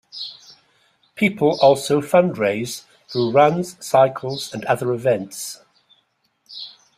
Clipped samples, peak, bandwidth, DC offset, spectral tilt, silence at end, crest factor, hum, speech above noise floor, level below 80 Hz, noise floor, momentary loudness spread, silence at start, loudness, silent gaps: under 0.1%; -2 dBFS; 15.5 kHz; under 0.1%; -5 dB/octave; 0.3 s; 18 dB; none; 48 dB; -62 dBFS; -66 dBFS; 18 LU; 0.15 s; -19 LUFS; none